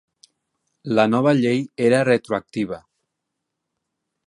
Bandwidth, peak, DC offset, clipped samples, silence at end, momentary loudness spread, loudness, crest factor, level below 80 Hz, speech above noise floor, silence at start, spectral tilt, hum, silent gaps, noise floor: 11.5 kHz; -2 dBFS; under 0.1%; under 0.1%; 1.5 s; 12 LU; -20 LUFS; 20 dB; -64 dBFS; 61 dB; 0.85 s; -6.5 dB/octave; none; none; -80 dBFS